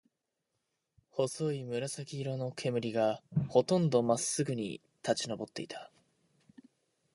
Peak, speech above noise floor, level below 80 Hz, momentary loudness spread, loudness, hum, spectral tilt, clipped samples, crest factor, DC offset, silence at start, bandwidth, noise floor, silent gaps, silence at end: -12 dBFS; 52 dB; -70 dBFS; 13 LU; -33 LUFS; none; -5 dB/octave; under 0.1%; 22 dB; under 0.1%; 1.15 s; 11.5 kHz; -85 dBFS; none; 1.3 s